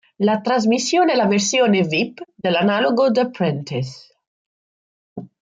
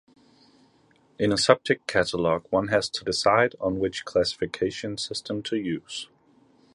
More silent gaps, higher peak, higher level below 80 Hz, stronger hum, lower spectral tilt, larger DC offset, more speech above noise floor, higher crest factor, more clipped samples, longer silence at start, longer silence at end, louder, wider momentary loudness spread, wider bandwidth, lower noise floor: first, 4.27-5.16 s vs none; second, -6 dBFS vs -2 dBFS; second, -64 dBFS vs -56 dBFS; neither; about the same, -4.5 dB/octave vs -4 dB/octave; neither; first, over 72 dB vs 36 dB; second, 14 dB vs 26 dB; neither; second, 0.2 s vs 1.2 s; second, 0.15 s vs 0.7 s; first, -18 LUFS vs -25 LUFS; about the same, 11 LU vs 10 LU; second, 9.4 kHz vs 11.5 kHz; first, under -90 dBFS vs -61 dBFS